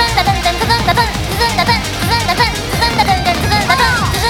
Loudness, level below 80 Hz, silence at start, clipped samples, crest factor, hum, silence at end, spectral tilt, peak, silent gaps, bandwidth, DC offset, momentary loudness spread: -13 LUFS; -24 dBFS; 0 s; under 0.1%; 12 dB; none; 0 s; -3.5 dB/octave; 0 dBFS; none; 19 kHz; under 0.1%; 3 LU